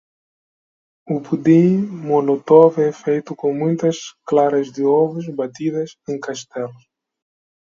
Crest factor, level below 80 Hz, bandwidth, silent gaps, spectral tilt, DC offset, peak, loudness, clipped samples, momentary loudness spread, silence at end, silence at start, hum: 18 dB; -66 dBFS; 7.6 kHz; none; -7.5 dB/octave; under 0.1%; 0 dBFS; -18 LUFS; under 0.1%; 14 LU; 0.9 s; 1.1 s; none